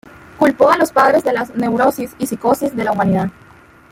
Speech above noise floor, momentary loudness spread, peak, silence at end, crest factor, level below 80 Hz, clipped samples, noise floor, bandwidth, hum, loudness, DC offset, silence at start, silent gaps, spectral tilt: 29 dB; 7 LU; -2 dBFS; 0.6 s; 14 dB; -52 dBFS; under 0.1%; -44 dBFS; 16.5 kHz; none; -15 LUFS; under 0.1%; 0.4 s; none; -6 dB/octave